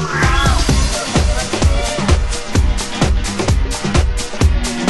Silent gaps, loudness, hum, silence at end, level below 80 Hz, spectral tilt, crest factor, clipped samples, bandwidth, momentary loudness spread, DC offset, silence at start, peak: none; -16 LUFS; none; 0 s; -16 dBFS; -4.5 dB/octave; 14 dB; under 0.1%; 12.5 kHz; 4 LU; under 0.1%; 0 s; 0 dBFS